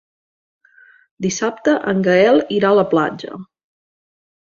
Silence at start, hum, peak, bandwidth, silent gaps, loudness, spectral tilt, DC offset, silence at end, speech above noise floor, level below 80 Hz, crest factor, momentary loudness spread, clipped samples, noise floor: 1.2 s; none; -2 dBFS; 7.4 kHz; none; -16 LUFS; -5 dB/octave; under 0.1%; 1 s; 34 dB; -60 dBFS; 16 dB; 16 LU; under 0.1%; -50 dBFS